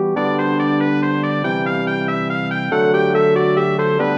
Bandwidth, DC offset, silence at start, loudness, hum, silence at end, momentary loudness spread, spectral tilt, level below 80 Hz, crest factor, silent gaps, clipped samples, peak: 7.4 kHz; under 0.1%; 0 s; -18 LUFS; none; 0 s; 5 LU; -8 dB/octave; -66 dBFS; 12 dB; none; under 0.1%; -4 dBFS